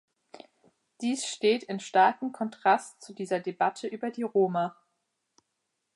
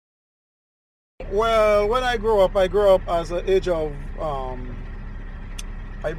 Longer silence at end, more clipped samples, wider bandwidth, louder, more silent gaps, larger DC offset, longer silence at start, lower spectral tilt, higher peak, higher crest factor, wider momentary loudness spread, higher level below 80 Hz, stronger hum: first, 1.25 s vs 0 s; neither; second, 11.5 kHz vs 17 kHz; second, -28 LUFS vs -21 LUFS; neither; neither; second, 0.35 s vs 1.2 s; second, -4 dB/octave vs -5.5 dB/octave; second, -10 dBFS vs -6 dBFS; about the same, 20 dB vs 16 dB; second, 11 LU vs 20 LU; second, -86 dBFS vs -34 dBFS; neither